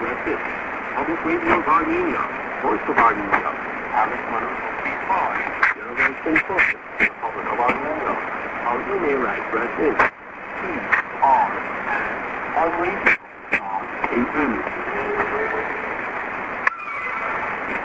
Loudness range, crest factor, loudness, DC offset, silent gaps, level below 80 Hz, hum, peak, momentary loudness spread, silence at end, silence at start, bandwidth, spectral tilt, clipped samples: 3 LU; 20 dB; -21 LUFS; under 0.1%; none; -50 dBFS; none; -2 dBFS; 8 LU; 0 s; 0 s; 8 kHz; -6 dB/octave; under 0.1%